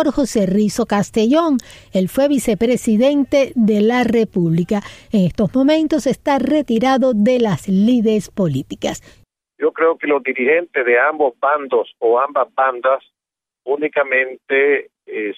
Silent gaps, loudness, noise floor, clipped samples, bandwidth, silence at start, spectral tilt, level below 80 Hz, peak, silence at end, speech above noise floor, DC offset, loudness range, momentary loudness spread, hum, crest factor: none; -16 LUFS; -87 dBFS; under 0.1%; 15.5 kHz; 0 s; -6 dB/octave; -48 dBFS; -4 dBFS; 0.05 s; 71 dB; under 0.1%; 2 LU; 7 LU; none; 12 dB